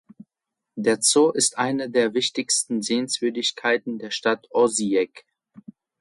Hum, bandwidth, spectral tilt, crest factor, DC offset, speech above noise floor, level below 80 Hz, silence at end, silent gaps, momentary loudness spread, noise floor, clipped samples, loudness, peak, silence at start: none; 12 kHz; -2 dB/octave; 18 dB; under 0.1%; 62 dB; -72 dBFS; 0.4 s; none; 7 LU; -85 dBFS; under 0.1%; -22 LUFS; -6 dBFS; 0.75 s